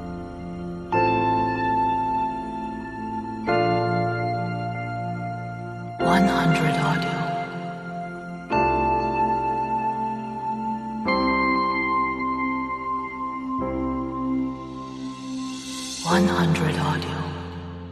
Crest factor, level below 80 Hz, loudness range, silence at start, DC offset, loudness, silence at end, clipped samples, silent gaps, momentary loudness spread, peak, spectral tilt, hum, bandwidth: 18 dB; -46 dBFS; 3 LU; 0 s; under 0.1%; -25 LUFS; 0 s; under 0.1%; none; 13 LU; -6 dBFS; -6 dB/octave; none; 13.5 kHz